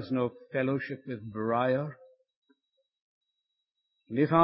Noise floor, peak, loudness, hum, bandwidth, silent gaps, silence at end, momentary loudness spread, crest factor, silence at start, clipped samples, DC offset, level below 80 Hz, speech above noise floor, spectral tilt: -84 dBFS; -8 dBFS; -31 LUFS; none; 5.8 kHz; 2.36-2.42 s, 3.02-3.21 s; 0 s; 11 LU; 22 dB; 0 s; under 0.1%; under 0.1%; -70 dBFS; 55 dB; -11 dB/octave